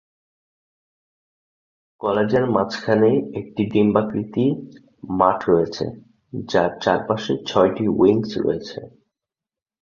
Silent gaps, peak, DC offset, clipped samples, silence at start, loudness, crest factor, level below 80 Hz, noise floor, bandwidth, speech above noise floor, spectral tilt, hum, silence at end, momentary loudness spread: none; -2 dBFS; under 0.1%; under 0.1%; 2 s; -20 LUFS; 20 dB; -54 dBFS; -90 dBFS; 7.2 kHz; 70 dB; -7 dB/octave; none; 0.95 s; 12 LU